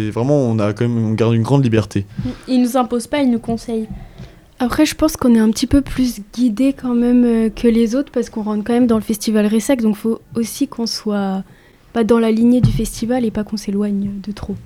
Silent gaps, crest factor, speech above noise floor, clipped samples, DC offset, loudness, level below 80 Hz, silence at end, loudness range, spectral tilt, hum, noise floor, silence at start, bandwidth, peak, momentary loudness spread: none; 14 dB; 22 dB; under 0.1%; under 0.1%; -17 LUFS; -36 dBFS; 0 s; 3 LU; -6.5 dB/octave; none; -38 dBFS; 0 s; 16 kHz; -2 dBFS; 9 LU